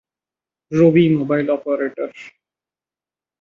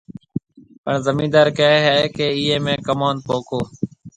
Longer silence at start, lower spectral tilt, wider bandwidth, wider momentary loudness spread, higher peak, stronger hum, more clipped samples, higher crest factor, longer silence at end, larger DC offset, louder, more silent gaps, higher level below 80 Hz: first, 0.7 s vs 0.1 s; first, -8.5 dB/octave vs -5.5 dB/octave; second, 7 kHz vs 9.2 kHz; about the same, 14 LU vs 16 LU; about the same, -2 dBFS vs 0 dBFS; neither; neither; about the same, 18 dB vs 18 dB; first, 1.15 s vs 0.1 s; neither; about the same, -17 LUFS vs -18 LUFS; second, none vs 0.78-0.84 s; second, -62 dBFS vs -52 dBFS